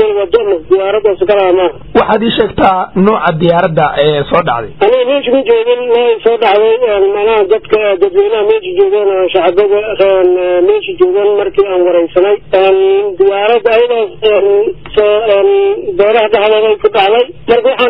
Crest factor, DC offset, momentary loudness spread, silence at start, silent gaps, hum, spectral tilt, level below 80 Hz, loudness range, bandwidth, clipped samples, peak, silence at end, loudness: 10 dB; 1%; 3 LU; 0 s; none; none; -8.5 dB/octave; -40 dBFS; 1 LU; 5.2 kHz; under 0.1%; 0 dBFS; 0 s; -10 LUFS